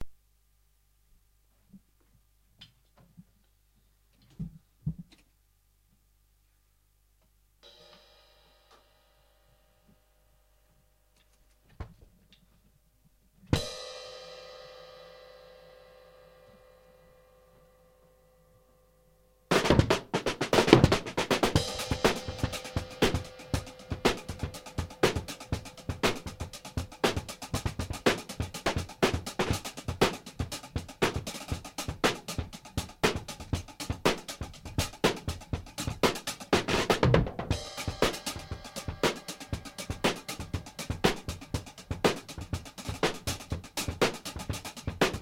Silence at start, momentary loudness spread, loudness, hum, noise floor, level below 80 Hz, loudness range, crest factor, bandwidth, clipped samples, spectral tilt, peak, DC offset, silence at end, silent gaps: 0 s; 14 LU; -31 LUFS; 50 Hz at -60 dBFS; -68 dBFS; -46 dBFS; 20 LU; 34 dB; 16.5 kHz; under 0.1%; -4.5 dB/octave; 0 dBFS; under 0.1%; 0 s; none